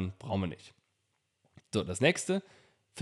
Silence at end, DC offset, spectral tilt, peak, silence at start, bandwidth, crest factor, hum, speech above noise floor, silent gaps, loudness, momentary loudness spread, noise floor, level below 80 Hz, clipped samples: 0 s; under 0.1%; -4.5 dB/octave; -12 dBFS; 0 s; 12.5 kHz; 22 dB; none; 47 dB; none; -32 LUFS; 15 LU; -79 dBFS; -66 dBFS; under 0.1%